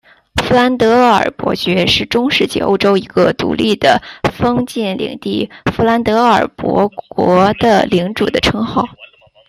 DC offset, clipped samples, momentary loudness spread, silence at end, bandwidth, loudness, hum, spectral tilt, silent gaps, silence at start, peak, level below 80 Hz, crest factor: under 0.1%; under 0.1%; 8 LU; 0.45 s; 15.5 kHz; -13 LUFS; none; -5.5 dB/octave; none; 0.35 s; 0 dBFS; -40 dBFS; 14 dB